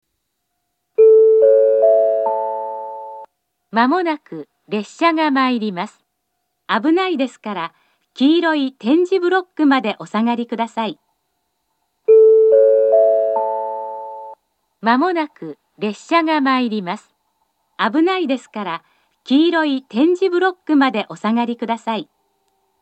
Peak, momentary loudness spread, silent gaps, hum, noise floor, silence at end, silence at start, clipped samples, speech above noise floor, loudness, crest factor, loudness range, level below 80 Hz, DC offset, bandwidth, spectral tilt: 0 dBFS; 16 LU; none; none; -73 dBFS; 0.8 s; 1 s; under 0.1%; 56 dB; -16 LUFS; 16 dB; 5 LU; -82 dBFS; under 0.1%; 8.4 kHz; -6 dB/octave